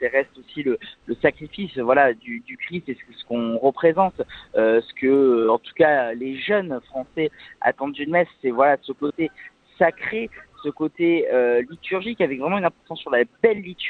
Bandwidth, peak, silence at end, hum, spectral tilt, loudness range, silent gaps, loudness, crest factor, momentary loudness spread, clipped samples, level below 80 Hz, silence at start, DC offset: 4.5 kHz; -2 dBFS; 0 s; none; -8 dB/octave; 3 LU; none; -22 LUFS; 20 dB; 13 LU; under 0.1%; -60 dBFS; 0 s; under 0.1%